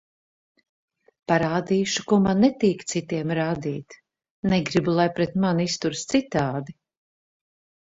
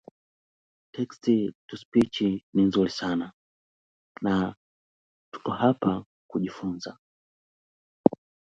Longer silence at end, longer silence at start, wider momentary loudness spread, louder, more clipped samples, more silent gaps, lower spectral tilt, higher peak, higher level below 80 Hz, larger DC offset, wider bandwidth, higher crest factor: first, 1.2 s vs 0.45 s; first, 1.3 s vs 0.95 s; second, 10 LU vs 15 LU; first, -23 LUFS vs -27 LUFS; neither; second, 4.30-4.43 s vs 1.55-1.68 s, 1.85-1.92 s, 2.43-2.53 s, 3.34-4.15 s, 4.57-5.32 s, 6.06-6.29 s, 6.99-8.04 s; second, -5.5 dB/octave vs -7 dB/octave; second, -6 dBFS vs 0 dBFS; about the same, -56 dBFS vs -60 dBFS; neither; about the same, 8 kHz vs 8.8 kHz; second, 20 dB vs 28 dB